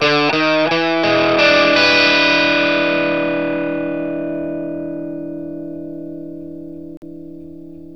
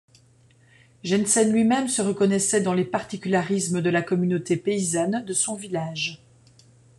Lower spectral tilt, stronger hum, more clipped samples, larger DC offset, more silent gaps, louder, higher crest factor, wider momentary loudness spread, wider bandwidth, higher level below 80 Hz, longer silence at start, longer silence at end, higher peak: about the same, -4.5 dB/octave vs -4.5 dB/octave; neither; neither; first, 0.7% vs under 0.1%; first, 6.97-7.02 s vs none; first, -15 LUFS vs -23 LUFS; about the same, 18 dB vs 16 dB; first, 23 LU vs 9 LU; second, 8.2 kHz vs 12.5 kHz; first, -54 dBFS vs -66 dBFS; second, 0 s vs 1.05 s; second, 0 s vs 0.8 s; first, 0 dBFS vs -8 dBFS